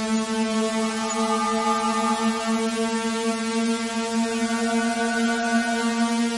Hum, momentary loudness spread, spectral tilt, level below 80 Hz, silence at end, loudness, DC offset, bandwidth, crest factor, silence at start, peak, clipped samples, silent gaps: none; 2 LU; -3.5 dB/octave; -60 dBFS; 0 s; -23 LUFS; under 0.1%; 11.5 kHz; 12 dB; 0 s; -10 dBFS; under 0.1%; none